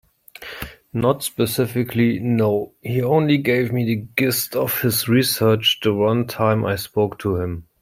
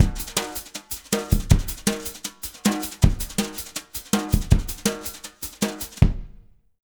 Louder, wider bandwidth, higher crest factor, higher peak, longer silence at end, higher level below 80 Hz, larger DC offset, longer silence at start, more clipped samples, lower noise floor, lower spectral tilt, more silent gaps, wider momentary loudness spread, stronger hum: first, -20 LUFS vs -25 LUFS; second, 16.5 kHz vs over 20 kHz; second, 16 dB vs 22 dB; about the same, -4 dBFS vs -2 dBFS; second, 0.2 s vs 0.45 s; second, -52 dBFS vs -28 dBFS; neither; first, 0.4 s vs 0 s; neither; second, -39 dBFS vs -48 dBFS; about the same, -5 dB/octave vs -4.5 dB/octave; neither; second, 8 LU vs 11 LU; neither